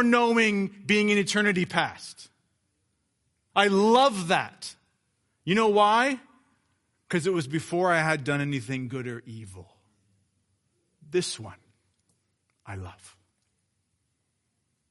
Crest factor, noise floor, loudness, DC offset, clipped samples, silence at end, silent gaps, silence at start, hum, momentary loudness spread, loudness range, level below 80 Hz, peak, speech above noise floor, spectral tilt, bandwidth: 22 dB; -76 dBFS; -24 LUFS; under 0.1%; under 0.1%; 1.85 s; none; 0 s; none; 20 LU; 13 LU; -70 dBFS; -6 dBFS; 52 dB; -4.5 dB/octave; 11.5 kHz